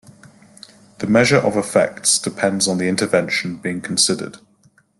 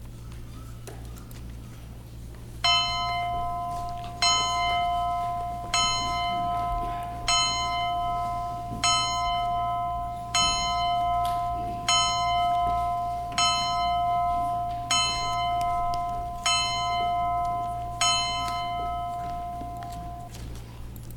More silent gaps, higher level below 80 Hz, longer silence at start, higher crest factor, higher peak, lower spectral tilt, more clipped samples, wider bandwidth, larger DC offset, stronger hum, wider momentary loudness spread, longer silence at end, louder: neither; second, -58 dBFS vs -42 dBFS; first, 1 s vs 0 s; about the same, 18 dB vs 16 dB; first, -2 dBFS vs -10 dBFS; first, -3.5 dB/octave vs -2 dB/octave; neither; second, 12.5 kHz vs 18.5 kHz; neither; neither; second, 10 LU vs 19 LU; first, 0.6 s vs 0 s; first, -17 LUFS vs -26 LUFS